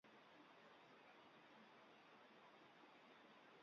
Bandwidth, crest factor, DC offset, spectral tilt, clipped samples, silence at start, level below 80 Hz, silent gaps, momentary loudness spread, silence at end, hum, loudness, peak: 6.8 kHz; 14 dB; under 0.1%; -1.5 dB/octave; under 0.1%; 0.05 s; under -90 dBFS; none; 0 LU; 0 s; none; -67 LUFS; -54 dBFS